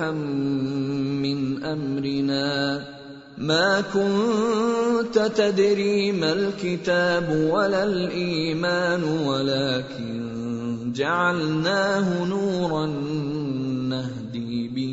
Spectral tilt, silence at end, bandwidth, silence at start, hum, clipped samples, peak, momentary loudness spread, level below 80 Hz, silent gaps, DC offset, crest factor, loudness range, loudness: -6 dB/octave; 0 s; 8 kHz; 0 s; none; under 0.1%; -8 dBFS; 8 LU; -58 dBFS; none; under 0.1%; 16 dB; 3 LU; -23 LUFS